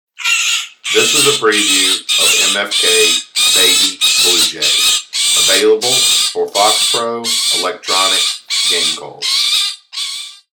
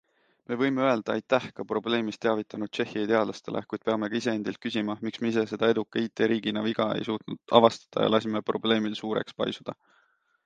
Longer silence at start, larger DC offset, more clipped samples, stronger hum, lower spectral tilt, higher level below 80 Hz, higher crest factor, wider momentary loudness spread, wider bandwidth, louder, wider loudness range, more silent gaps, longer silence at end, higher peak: second, 0.2 s vs 0.5 s; neither; neither; neither; second, 0.5 dB/octave vs -5.5 dB/octave; first, -58 dBFS vs -70 dBFS; second, 14 dB vs 24 dB; about the same, 7 LU vs 8 LU; first, over 20 kHz vs 9 kHz; first, -11 LUFS vs -27 LUFS; about the same, 3 LU vs 3 LU; neither; second, 0.2 s vs 0.75 s; first, 0 dBFS vs -4 dBFS